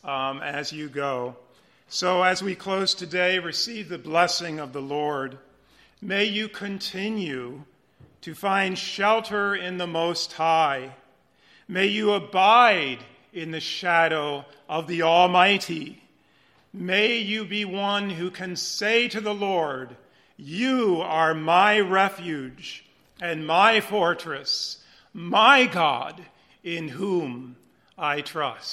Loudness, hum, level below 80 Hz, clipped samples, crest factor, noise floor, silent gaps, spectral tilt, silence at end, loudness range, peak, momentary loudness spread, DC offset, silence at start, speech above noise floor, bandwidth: -23 LUFS; none; -70 dBFS; under 0.1%; 24 dB; -61 dBFS; none; -3.5 dB/octave; 0 s; 5 LU; -2 dBFS; 17 LU; under 0.1%; 0.05 s; 37 dB; 16 kHz